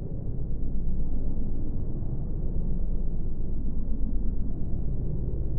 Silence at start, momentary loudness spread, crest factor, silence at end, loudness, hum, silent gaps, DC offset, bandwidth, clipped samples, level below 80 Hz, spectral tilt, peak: 0 s; 2 LU; 12 dB; 0 s; -34 LUFS; none; none; under 0.1%; 1.1 kHz; under 0.1%; -28 dBFS; -15.5 dB/octave; -12 dBFS